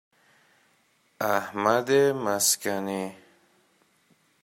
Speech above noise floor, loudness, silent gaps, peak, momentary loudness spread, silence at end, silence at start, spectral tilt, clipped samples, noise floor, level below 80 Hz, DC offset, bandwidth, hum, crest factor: 41 dB; -25 LUFS; none; -8 dBFS; 10 LU; 1.3 s; 1.2 s; -3 dB/octave; under 0.1%; -66 dBFS; -74 dBFS; under 0.1%; 16 kHz; none; 20 dB